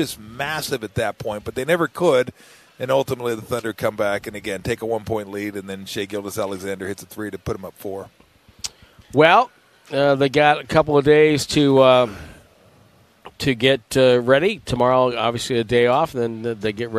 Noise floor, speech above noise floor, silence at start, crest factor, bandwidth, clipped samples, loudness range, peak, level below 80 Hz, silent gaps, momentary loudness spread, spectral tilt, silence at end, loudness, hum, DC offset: -53 dBFS; 34 dB; 0 s; 20 dB; 14.5 kHz; under 0.1%; 11 LU; 0 dBFS; -50 dBFS; none; 15 LU; -5 dB/octave; 0 s; -19 LUFS; none; under 0.1%